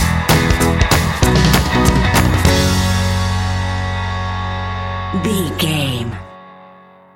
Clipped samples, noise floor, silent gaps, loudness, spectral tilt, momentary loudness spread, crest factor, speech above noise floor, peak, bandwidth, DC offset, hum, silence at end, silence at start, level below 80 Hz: under 0.1%; -43 dBFS; none; -15 LUFS; -5 dB/octave; 9 LU; 16 dB; 25 dB; 0 dBFS; 17 kHz; under 0.1%; none; 0.5 s; 0 s; -24 dBFS